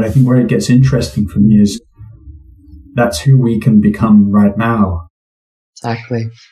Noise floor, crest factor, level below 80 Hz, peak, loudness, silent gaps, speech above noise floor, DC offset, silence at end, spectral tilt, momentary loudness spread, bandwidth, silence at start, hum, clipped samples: -38 dBFS; 12 dB; -36 dBFS; 0 dBFS; -12 LUFS; 5.10-5.73 s; 27 dB; under 0.1%; 0.2 s; -7.5 dB/octave; 12 LU; 13.5 kHz; 0 s; none; under 0.1%